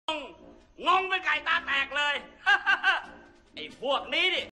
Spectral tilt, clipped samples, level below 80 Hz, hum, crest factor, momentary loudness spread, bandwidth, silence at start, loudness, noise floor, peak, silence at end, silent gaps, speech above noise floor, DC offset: -1.5 dB/octave; under 0.1%; -62 dBFS; none; 16 dB; 14 LU; 11.5 kHz; 0.1 s; -26 LUFS; -52 dBFS; -12 dBFS; 0 s; none; 24 dB; under 0.1%